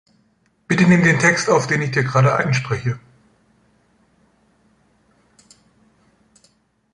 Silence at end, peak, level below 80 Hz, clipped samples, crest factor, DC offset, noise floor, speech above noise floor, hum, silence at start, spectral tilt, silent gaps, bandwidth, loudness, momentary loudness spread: 3.95 s; -2 dBFS; -54 dBFS; under 0.1%; 20 dB; under 0.1%; -62 dBFS; 45 dB; none; 0.7 s; -5.5 dB/octave; none; 11 kHz; -17 LUFS; 11 LU